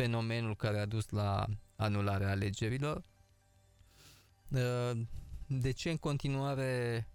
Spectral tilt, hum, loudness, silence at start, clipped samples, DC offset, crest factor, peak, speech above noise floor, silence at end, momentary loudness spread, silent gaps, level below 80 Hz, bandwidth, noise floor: -6.5 dB/octave; none; -36 LUFS; 0 s; under 0.1%; under 0.1%; 16 dB; -20 dBFS; 33 dB; 0.05 s; 6 LU; none; -54 dBFS; 13.5 kHz; -67 dBFS